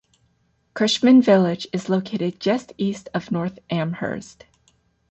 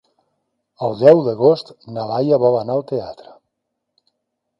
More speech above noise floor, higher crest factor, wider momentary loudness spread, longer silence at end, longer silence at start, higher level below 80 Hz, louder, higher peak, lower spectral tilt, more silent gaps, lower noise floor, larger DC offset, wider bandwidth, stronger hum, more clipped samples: second, 45 dB vs 60 dB; about the same, 16 dB vs 18 dB; about the same, 14 LU vs 15 LU; second, 0.85 s vs 1.45 s; about the same, 0.75 s vs 0.8 s; about the same, -60 dBFS vs -62 dBFS; second, -21 LUFS vs -17 LUFS; second, -4 dBFS vs 0 dBFS; second, -6 dB/octave vs -8.5 dB/octave; neither; second, -65 dBFS vs -76 dBFS; neither; first, 8.2 kHz vs 7 kHz; neither; neither